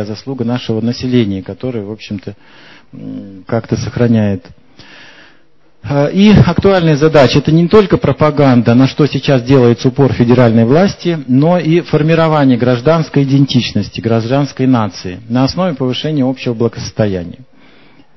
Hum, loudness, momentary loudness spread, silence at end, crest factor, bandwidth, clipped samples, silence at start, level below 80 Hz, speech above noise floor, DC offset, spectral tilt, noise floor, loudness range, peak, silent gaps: none; -11 LUFS; 14 LU; 0.75 s; 12 dB; 7.2 kHz; 0.4%; 0 s; -36 dBFS; 41 dB; 0.7%; -7.5 dB/octave; -52 dBFS; 9 LU; 0 dBFS; none